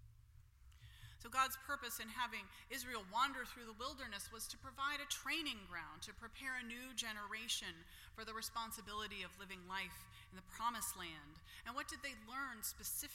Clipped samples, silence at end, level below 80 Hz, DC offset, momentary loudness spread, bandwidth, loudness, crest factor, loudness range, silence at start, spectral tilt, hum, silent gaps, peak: under 0.1%; 0 s; -66 dBFS; under 0.1%; 16 LU; 16.5 kHz; -45 LUFS; 24 dB; 4 LU; 0 s; -1 dB/octave; none; none; -24 dBFS